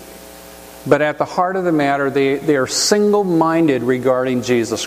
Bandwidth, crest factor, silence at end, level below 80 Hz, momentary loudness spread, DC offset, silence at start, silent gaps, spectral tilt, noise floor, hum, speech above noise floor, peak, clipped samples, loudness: 15.5 kHz; 16 dB; 0 s; -52 dBFS; 20 LU; under 0.1%; 0 s; none; -4.5 dB/octave; -37 dBFS; none; 22 dB; 0 dBFS; under 0.1%; -16 LUFS